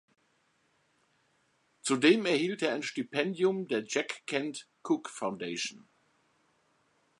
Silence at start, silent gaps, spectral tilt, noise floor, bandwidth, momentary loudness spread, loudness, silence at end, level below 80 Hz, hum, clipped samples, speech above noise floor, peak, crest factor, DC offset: 1.85 s; none; -4 dB/octave; -72 dBFS; 11.5 kHz; 12 LU; -31 LUFS; 1.4 s; -84 dBFS; none; under 0.1%; 42 dB; -10 dBFS; 24 dB; under 0.1%